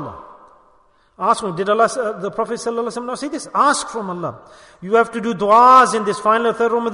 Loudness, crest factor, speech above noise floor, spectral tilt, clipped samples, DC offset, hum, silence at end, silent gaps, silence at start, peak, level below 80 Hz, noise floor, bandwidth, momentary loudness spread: -17 LUFS; 16 dB; 38 dB; -4 dB/octave; under 0.1%; under 0.1%; none; 0 s; none; 0 s; 0 dBFS; -58 dBFS; -55 dBFS; 11 kHz; 15 LU